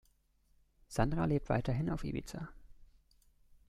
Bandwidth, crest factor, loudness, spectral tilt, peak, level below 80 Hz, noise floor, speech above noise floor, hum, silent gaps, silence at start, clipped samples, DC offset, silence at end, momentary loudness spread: 14 kHz; 24 dB; -36 LUFS; -7.5 dB/octave; -14 dBFS; -48 dBFS; -71 dBFS; 37 dB; none; none; 0.9 s; under 0.1%; under 0.1%; 0.85 s; 14 LU